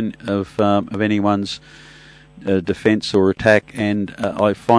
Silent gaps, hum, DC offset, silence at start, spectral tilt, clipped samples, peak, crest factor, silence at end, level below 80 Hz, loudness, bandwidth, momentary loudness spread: none; none; under 0.1%; 0 s; -6.5 dB/octave; under 0.1%; 0 dBFS; 18 dB; 0 s; -50 dBFS; -18 LUFS; 11 kHz; 8 LU